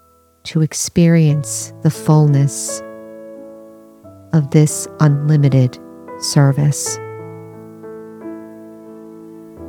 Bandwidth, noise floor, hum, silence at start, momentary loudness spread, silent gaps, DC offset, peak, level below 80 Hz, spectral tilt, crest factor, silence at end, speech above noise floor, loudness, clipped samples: 15.5 kHz; -41 dBFS; none; 0.45 s; 24 LU; none; under 0.1%; 0 dBFS; -54 dBFS; -6 dB/octave; 16 dB; 0 s; 27 dB; -15 LUFS; under 0.1%